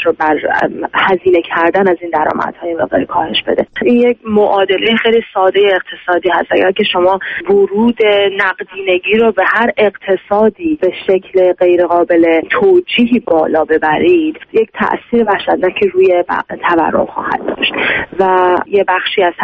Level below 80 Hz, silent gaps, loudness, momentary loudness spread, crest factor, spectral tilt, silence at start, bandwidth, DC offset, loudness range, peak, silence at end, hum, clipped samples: -48 dBFS; none; -12 LUFS; 5 LU; 12 dB; -7 dB/octave; 0 s; 5.2 kHz; under 0.1%; 2 LU; 0 dBFS; 0 s; none; under 0.1%